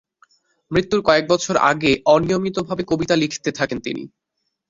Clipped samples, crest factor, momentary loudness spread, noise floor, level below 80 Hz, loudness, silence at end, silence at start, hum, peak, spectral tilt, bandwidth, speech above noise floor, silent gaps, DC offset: under 0.1%; 18 dB; 8 LU; -58 dBFS; -50 dBFS; -19 LUFS; 0.65 s; 0.7 s; none; -2 dBFS; -4.5 dB/octave; 7.8 kHz; 40 dB; none; under 0.1%